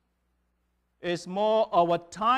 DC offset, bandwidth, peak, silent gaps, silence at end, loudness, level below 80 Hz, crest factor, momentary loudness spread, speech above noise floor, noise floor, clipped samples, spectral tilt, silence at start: under 0.1%; 10 kHz; -12 dBFS; none; 0 s; -26 LUFS; -66 dBFS; 16 dB; 10 LU; 49 dB; -74 dBFS; under 0.1%; -5.5 dB/octave; 1.05 s